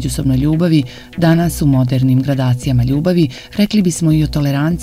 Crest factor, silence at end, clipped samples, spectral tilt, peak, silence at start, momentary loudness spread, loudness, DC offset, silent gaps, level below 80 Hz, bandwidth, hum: 14 dB; 0 s; under 0.1%; -6.5 dB/octave; 0 dBFS; 0 s; 3 LU; -14 LUFS; under 0.1%; none; -32 dBFS; 15.5 kHz; none